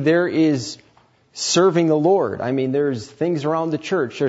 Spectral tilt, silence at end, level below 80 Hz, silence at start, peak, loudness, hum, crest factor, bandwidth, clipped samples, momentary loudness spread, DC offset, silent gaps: -5 dB/octave; 0 s; -64 dBFS; 0 s; -4 dBFS; -19 LUFS; none; 14 dB; 8 kHz; under 0.1%; 9 LU; under 0.1%; none